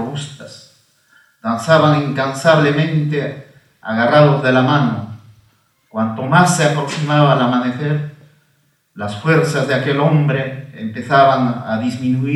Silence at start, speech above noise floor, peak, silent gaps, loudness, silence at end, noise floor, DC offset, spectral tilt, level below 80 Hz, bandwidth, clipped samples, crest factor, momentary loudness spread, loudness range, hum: 0 s; 45 dB; 0 dBFS; none; -15 LUFS; 0 s; -60 dBFS; under 0.1%; -6 dB/octave; -62 dBFS; 12 kHz; under 0.1%; 16 dB; 16 LU; 3 LU; none